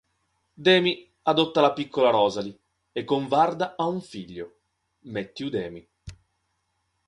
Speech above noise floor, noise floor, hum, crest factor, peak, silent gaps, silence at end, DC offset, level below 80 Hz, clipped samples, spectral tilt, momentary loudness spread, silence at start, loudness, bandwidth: 51 dB; -75 dBFS; none; 22 dB; -4 dBFS; none; 0.95 s; under 0.1%; -60 dBFS; under 0.1%; -5.5 dB/octave; 18 LU; 0.6 s; -24 LUFS; 10.5 kHz